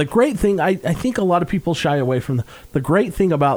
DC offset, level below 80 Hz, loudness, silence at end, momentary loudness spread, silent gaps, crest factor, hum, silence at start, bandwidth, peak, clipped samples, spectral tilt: under 0.1%; -40 dBFS; -19 LUFS; 0 s; 7 LU; none; 14 dB; none; 0 s; over 20 kHz; -4 dBFS; under 0.1%; -7 dB/octave